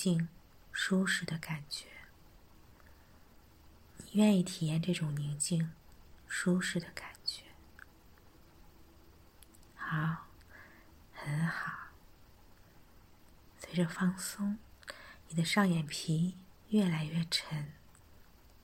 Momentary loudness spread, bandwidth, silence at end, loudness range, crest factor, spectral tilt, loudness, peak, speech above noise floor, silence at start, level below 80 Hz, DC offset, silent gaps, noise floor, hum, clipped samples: 22 LU; 16.5 kHz; 0.9 s; 9 LU; 22 dB; -5 dB/octave; -34 LUFS; -16 dBFS; 27 dB; 0 s; -64 dBFS; under 0.1%; none; -60 dBFS; none; under 0.1%